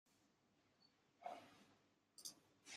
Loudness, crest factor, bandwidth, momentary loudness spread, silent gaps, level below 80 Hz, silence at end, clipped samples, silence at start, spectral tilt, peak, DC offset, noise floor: -59 LUFS; 24 dB; 15 kHz; 11 LU; none; under -90 dBFS; 0 s; under 0.1%; 0.05 s; -1 dB/octave; -38 dBFS; under 0.1%; -80 dBFS